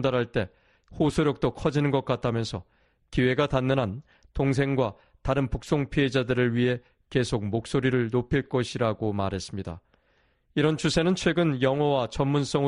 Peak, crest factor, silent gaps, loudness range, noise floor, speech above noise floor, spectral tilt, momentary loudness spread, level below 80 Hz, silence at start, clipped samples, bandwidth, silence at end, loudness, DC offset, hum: -8 dBFS; 18 dB; none; 2 LU; -67 dBFS; 42 dB; -6.5 dB/octave; 9 LU; -46 dBFS; 0 s; under 0.1%; 10.5 kHz; 0 s; -26 LUFS; under 0.1%; none